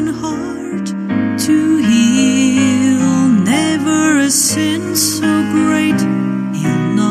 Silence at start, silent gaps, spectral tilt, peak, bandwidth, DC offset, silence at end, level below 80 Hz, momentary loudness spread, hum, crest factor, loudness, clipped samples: 0 s; none; -4 dB/octave; -2 dBFS; 15.5 kHz; under 0.1%; 0 s; -52 dBFS; 8 LU; none; 12 dB; -13 LUFS; under 0.1%